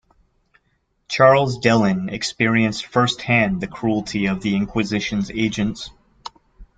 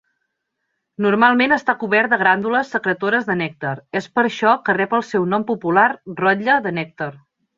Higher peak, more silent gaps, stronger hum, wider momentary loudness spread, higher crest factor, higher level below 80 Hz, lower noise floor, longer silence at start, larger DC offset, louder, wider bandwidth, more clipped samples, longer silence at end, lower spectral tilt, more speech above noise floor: about the same, -2 dBFS vs 0 dBFS; neither; neither; first, 16 LU vs 10 LU; about the same, 18 dB vs 18 dB; first, -48 dBFS vs -64 dBFS; second, -67 dBFS vs -75 dBFS; about the same, 1.1 s vs 1 s; neither; about the same, -19 LUFS vs -18 LUFS; first, 9.2 kHz vs 7.6 kHz; neither; second, 0.15 s vs 0.4 s; about the same, -5.5 dB/octave vs -6 dB/octave; second, 48 dB vs 57 dB